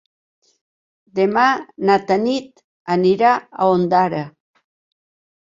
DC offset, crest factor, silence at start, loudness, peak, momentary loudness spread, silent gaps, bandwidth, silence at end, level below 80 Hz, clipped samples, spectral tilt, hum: under 0.1%; 18 dB; 1.15 s; -17 LUFS; -2 dBFS; 12 LU; 2.64-2.85 s; 7.6 kHz; 1.2 s; -62 dBFS; under 0.1%; -6.5 dB/octave; none